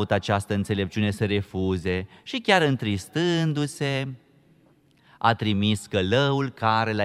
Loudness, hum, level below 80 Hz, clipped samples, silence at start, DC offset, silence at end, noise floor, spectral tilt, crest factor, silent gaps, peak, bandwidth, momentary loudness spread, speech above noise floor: -24 LUFS; none; -54 dBFS; under 0.1%; 0 s; under 0.1%; 0 s; -59 dBFS; -6 dB/octave; 20 dB; none; -4 dBFS; 13.5 kHz; 6 LU; 35 dB